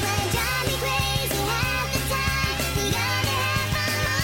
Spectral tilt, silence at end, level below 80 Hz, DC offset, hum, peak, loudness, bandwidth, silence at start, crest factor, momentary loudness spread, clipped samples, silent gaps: -3.5 dB/octave; 0 s; -36 dBFS; under 0.1%; none; -12 dBFS; -23 LUFS; 17 kHz; 0 s; 12 dB; 1 LU; under 0.1%; none